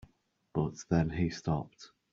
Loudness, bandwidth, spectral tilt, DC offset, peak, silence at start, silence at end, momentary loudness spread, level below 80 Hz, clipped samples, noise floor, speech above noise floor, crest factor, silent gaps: -33 LUFS; 7.6 kHz; -7 dB/octave; under 0.1%; -14 dBFS; 0.55 s; 0.25 s; 7 LU; -54 dBFS; under 0.1%; -71 dBFS; 38 dB; 20 dB; none